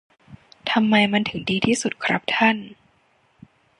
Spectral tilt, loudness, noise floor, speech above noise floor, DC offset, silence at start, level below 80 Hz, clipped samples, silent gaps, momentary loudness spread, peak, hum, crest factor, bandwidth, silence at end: -4 dB/octave; -21 LUFS; -62 dBFS; 41 dB; under 0.1%; 0.3 s; -58 dBFS; under 0.1%; none; 7 LU; -2 dBFS; none; 20 dB; 11 kHz; 1.05 s